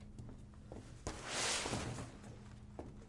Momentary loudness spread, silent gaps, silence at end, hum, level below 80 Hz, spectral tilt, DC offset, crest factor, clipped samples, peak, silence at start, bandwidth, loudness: 18 LU; none; 0 s; none; -58 dBFS; -2.5 dB/octave; under 0.1%; 20 dB; under 0.1%; -24 dBFS; 0 s; 11.5 kHz; -41 LUFS